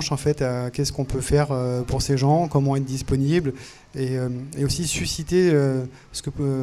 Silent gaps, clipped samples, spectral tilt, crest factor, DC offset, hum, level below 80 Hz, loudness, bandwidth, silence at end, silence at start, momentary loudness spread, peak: none; under 0.1%; -6 dB/octave; 16 dB; under 0.1%; none; -38 dBFS; -23 LUFS; 14 kHz; 0 s; 0 s; 10 LU; -6 dBFS